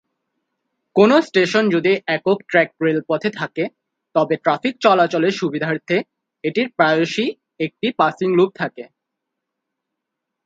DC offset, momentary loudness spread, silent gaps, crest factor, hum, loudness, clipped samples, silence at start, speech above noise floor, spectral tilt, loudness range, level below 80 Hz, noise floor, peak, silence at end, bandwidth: under 0.1%; 11 LU; none; 20 dB; none; -18 LUFS; under 0.1%; 0.95 s; 63 dB; -6 dB/octave; 3 LU; -68 dBFS; -80 dBFS; 0 dBFS; 1.6 s; 7.8 kHz